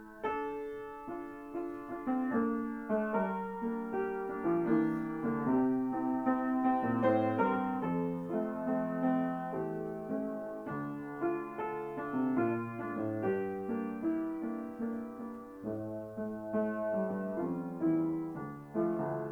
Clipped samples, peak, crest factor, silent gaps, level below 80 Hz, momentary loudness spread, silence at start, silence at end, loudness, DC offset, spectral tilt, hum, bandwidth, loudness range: under 0.1%; -16 dBFS; 18 dB; none; -66 dBFS; 10 LU; 0 s; 0 s; -35 LUFS; under 0.1%; -9.5 dB/octave; none; 4.4 kHz; 6 LU